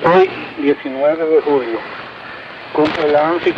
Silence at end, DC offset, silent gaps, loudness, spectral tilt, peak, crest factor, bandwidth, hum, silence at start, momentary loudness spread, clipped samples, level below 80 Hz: 0 s; under 0.1%; none; -16 LUFS; -7 dB/octave; 0 dBFS; 14 dB; 7.2 kHz; none; 0 s; 17 LU; under 0.1%; -54 dBFS